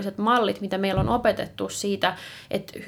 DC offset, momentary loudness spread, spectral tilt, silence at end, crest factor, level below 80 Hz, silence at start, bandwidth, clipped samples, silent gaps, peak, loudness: under 0.1%; 10 LU; -5 dB/octave; 0 s; 18 dB; -46 dBFS; 0 s; 18.5 kHz; under 0.1%; none; -8 dBFS; -25 LUFS